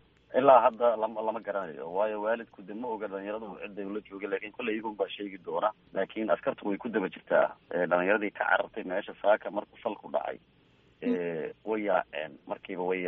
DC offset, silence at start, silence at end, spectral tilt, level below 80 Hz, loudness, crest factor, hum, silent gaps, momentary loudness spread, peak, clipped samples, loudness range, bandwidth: under 0.1%; 0.3 s; 0 s; -3.5 dB/octave; -72 dBFS; -30 LUFS; 24 dB; none; none; 12 LU; -8 dBFS; under 0.1%; 6 LU; 4 kHz